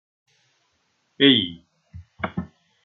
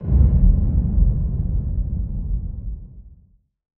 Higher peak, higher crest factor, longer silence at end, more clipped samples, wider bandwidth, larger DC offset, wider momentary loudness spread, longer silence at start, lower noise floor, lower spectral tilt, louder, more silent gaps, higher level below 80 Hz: about the same, -2 dBFS vs -4 dBFS; first, 24 dB vs 16 dB; second, 0.4 s vs 0.65 s; neither; first, 4.3 kHz vs 1.4 kHz; neither; first, 18 LU vs 15 LU; first, 1.2 s vs 0 s; first, -69 dBFS vs -55 dBFS; second, -7 dB/octave vs -15 dB/octave; about the same, -20 LUFS vs -21 LUFS; neither; second, -60 dBFS vs -20 dBFS